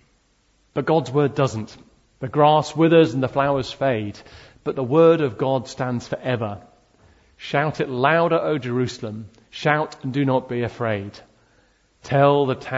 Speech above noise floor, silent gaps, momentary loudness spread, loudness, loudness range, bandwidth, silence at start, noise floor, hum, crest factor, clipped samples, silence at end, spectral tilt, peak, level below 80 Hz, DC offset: 42 dB; none; 16 LU; -21 LUFS; 4 LU; 8 kHz; 0.75 s; -62 dBFS; none; 18 dB; under 0.1%; 0 s; -7 dB/octave; -2 dBFS; -56 dBFS; under 0.1%